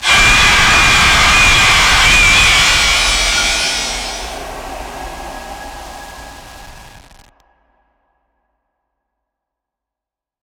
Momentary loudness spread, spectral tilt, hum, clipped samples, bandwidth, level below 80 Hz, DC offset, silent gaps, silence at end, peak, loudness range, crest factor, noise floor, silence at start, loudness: 22 LU; -1 dB/octave; none; under 0.1%; over 20 kHz; -26 dBFS; under 0.1%; none; 3.45 s; 0 dBFS; 23 LU; 14 dB; -87 dBFS; 0 s; -8 LUFS